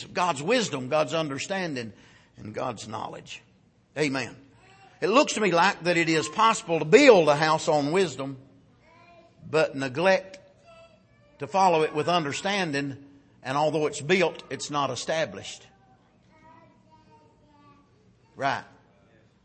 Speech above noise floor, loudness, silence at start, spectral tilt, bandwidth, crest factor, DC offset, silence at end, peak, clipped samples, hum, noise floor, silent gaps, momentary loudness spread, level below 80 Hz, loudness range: 36 dB; -24 LUFS; 0 s; -4 dB/octave; 8.8 kHz; 24 dB; under 0.1%; 0.8 s; -4 dBFS; under 0.1%; none; -60 dBFS; none; 18 LU; -68 dBFS; 13 LU